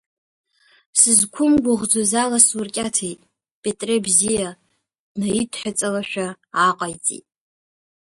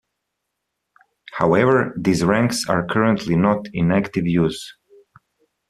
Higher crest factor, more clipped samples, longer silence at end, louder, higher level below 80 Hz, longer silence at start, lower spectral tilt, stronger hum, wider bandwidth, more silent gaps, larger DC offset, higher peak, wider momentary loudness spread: about the same, 22 dB vs 20 dB; neither; about the same, 0.95 s vs 1 s; about the same, -18 LUFS vs -19 LUFS; about the same, -56 dBFS vs -52 dBFS; second, 0.95 s vs 1.3 s; second, -2.5 dB/octave vs -6 dB/octave; neither; second, 12 kHz vs 13.5 kHz; first, 3.51-3.63 s, 4.99-5.15 s vs none; neither; about the same, 0 dBFS vs -2 dBFS; first, 13 LU vs 6 LU